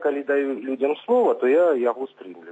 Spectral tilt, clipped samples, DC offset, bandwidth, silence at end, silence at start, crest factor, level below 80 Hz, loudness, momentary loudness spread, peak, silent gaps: -6.5 dB/octave; under 0.1%; under 0.1%; 8 kHz; 0 s; 0 s; 12 dB; -82 dBFS; -22 LUFS; 13 LU; -10 dBFS; none